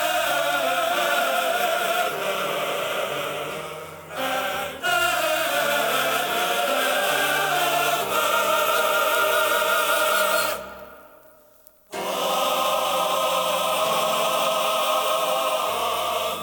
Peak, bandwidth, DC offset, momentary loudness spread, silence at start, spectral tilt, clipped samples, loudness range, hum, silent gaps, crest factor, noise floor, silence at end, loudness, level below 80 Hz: -8 dBFS; over 20 kHz; under 0.1%; 7 LU; 0 s; -1 dB/octave; under 0.1%; 5 LU; none; none; 14 dB; -53 dBFS; 0 s; -22 LUFS; -62 dBFS